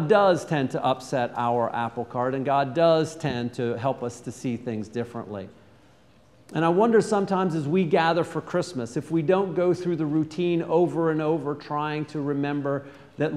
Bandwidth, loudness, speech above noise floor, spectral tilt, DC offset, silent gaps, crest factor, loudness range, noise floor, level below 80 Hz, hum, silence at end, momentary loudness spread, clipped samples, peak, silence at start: 12 kHz; -25 LUFS; 32 dB; -6.5 dB/octave; under 0.1%; none; 18 dB; 5 LU; -56 dBFS; -64 dBFS; none; 0 s; 11 LU; under 0.1%; -8 dBFS; 0 s